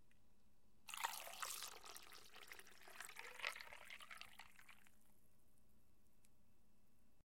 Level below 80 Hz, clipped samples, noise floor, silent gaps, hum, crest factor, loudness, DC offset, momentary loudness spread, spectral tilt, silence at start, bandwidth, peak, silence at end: -82 dBFS; under 0.1%; -78 dBFS; none; none; 32 dB; -53 LUFS; under 0.1%; 16 LU; 0.5 dB/octave; 0 s; 16.5 kHz; -24 dBFS; 0 s